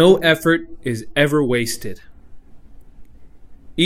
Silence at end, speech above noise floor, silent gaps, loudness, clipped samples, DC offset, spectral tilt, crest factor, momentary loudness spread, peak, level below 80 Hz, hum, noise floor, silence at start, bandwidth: 0 s; 22 dB; none; -18 LUFS; under 0.1%; under 0.1%; -5 dB/octave; 18 dB; 15 LU; 0 dBFS; -44 dBFS; none; -39 dBFS; 0 s; 16 kHz